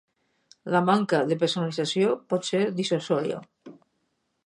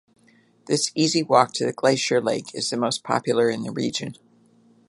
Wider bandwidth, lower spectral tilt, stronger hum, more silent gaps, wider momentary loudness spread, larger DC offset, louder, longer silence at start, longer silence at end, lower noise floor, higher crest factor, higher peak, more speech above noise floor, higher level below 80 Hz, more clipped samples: about the same, 11 kHz vs 11.5 kHz; first, -5.5 dB/octave vs -4 dB/octave; neither; neither; second, 5 LU vs 8 LU; neither; second, -25 LUFS vs -22 LUFS; about the same, 0.65 s vs 0.7 s; about the same, 0.75 s vs 0.75 s; first, -75 dBFS vs -58 dBFS; about the same, 18 dB vs 22 dB; second, -8 dBFS vs -2 dBFS; first, 50 dB vs 36 dB; second, -74 dBFS vs -68 dBFS; neither